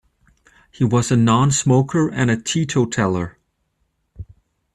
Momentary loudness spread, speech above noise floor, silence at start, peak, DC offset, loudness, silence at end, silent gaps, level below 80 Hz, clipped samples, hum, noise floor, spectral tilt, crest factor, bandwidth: 7 LU; 52 dB; 0.8 s; -4 dBFS; under 0.1%; -18 LUFS; 0.5 s; none; -50 dBFS; under 0.1%; none; -69 dBFS; -5.5 dB/octave; 16 dB; 12 kHz